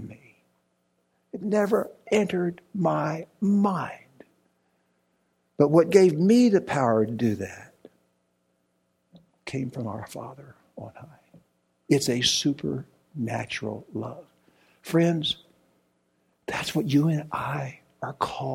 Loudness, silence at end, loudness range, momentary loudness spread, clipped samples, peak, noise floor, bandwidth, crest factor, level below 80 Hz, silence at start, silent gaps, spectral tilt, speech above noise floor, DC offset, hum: -25 LUFS; 0 s; 15 LU; 23 LU; under 0.1%; -4 dBFS; -72 dBFS; 16.5 kHz; 24 dB; -64 dBFS; 0 s; none; -5.5 dB/octave; 48 dB; under 0.1%; 60 Hz at -55 dBFS